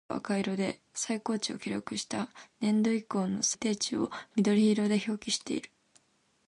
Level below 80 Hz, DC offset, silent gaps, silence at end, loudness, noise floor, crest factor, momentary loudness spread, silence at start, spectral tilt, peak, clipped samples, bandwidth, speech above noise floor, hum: -70 dBFS; under 0.1%; none; 0.8 s; -31 LUFS; -68 dBFS; 16 dB; 10 LU; 0.1 s; -4 dB/octave; -16 dBFS; under 0.1%; 11.5 kHz; 38 dB; none